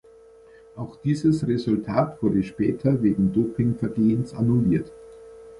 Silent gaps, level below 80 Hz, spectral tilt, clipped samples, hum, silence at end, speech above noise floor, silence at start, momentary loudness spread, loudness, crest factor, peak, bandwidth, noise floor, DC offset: none; -50 dBFS; -9 dB/octave; under 0.1%; none; 0 s; 28 dB; 0.75 s; 6 LU; -23 LUFS; 16 dB; -6 dBFS; 11 kHz; -50 dBFS; under 0.1%